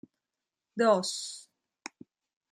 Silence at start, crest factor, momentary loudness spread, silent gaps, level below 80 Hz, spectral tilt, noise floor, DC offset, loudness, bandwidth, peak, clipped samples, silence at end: 0.75 s; 22 dB; 21 LU; none; -84 dBFS; -3.5 dB/octave; -89 dBFS; under 0.1%; -29 LUFS; 13 kHz; -10 dBFS; under 0.1%; 1.1 s